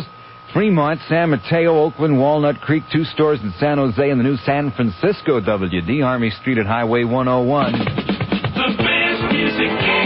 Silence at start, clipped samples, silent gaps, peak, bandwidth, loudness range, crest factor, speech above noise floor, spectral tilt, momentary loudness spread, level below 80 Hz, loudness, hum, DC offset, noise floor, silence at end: 0 s; under 0.1%; none; -6 dBFS; 5.8 kHz; 1 LU; 12 dB; 22 dB; -11.5 dB/octave; 5 LU; -44 dBFS; -17 LUFS; none; under 0.1%; -38 dBFS; 0 s